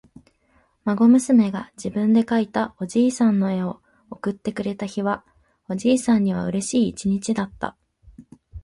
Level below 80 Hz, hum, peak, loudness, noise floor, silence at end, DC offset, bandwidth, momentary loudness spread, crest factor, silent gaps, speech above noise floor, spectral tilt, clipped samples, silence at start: -54 dBFS; none; -6 dBFS; -22 LUFS; -62 dBFS; 0.05 s; under 0.1%; 11.5 kHz; 13 LU; 16 dB; none; 42 dB; -6 dB/octave; under 0.1%; 0.85 s